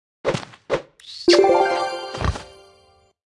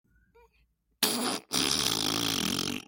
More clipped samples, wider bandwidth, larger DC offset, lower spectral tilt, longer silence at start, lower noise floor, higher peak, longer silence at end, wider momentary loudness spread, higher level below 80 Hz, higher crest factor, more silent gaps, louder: neither; second, 11.5 kHz vs 17 kHz; neither; first, -5 dB/octave vs -2 dB/octave; second, 0.25 s vs 1 s; second, -56 dBFS vs -70 dBFS; about the same, -4 dBFS vs -6 dBFS; first, 0.85 s vs 0.05 s; first, 14 LU vs 4 LU; first, -40 dBFS vs -60 dBFS; second, 18 dB vs 26 dB; neither; first, -20 LUFS vs -27 LUFS